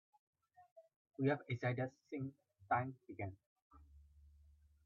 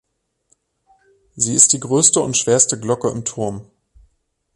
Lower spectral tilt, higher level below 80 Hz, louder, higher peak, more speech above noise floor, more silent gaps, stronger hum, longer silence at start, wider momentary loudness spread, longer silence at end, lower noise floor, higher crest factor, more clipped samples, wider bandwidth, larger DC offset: first, -6.5 dB/octave vs -3 dB/octave; second, -72 dBFS vs -54 dBFS; second, -42 LUFS vs -15 LUFS; second, -24 dBFS vs 0 dBFS; second, 27 dB vs 48 dB; first, 0.71-0.76 s, 0.96-1.05 s, 3.46-3.56 s, 3.62-3.70 s vs none; neither; second, 0.6 s vs 1.35 s; about the same, 11 LU vs 13 LU; second, 0.55 s vs 0.95 s; about the same, -68 dBFS vs -65 dBFS; about the same, 20 dB vs 20 dB; neither; second, 7 kHz vs 12.5 kHz; neither